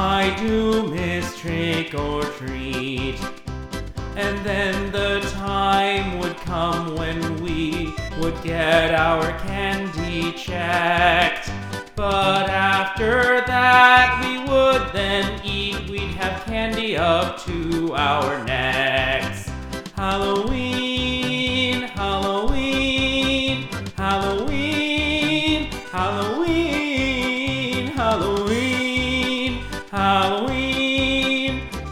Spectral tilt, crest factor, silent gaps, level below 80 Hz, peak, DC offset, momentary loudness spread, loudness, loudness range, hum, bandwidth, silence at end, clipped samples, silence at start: -5 dB/octave; 20 dB; none; -36 dBFS; 0 dBFS; under 0.1%; 9 LU; -21 LUFS; 6 LU; none; 17.5 kHz; 0 s; under 0.1%; 0 s